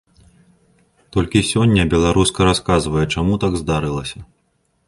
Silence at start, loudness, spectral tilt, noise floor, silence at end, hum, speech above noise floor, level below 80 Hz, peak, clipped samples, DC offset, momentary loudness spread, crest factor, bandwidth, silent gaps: 1.15 s; -17 LUFS; -5.5 dB/octave; -65 dBFS; 0.65 s; none; 48 dB; -32 dBFS; 0 dBFS; under 0.1%; under 0.1%; 9 LU; 18 dB; 11.5 kHz; none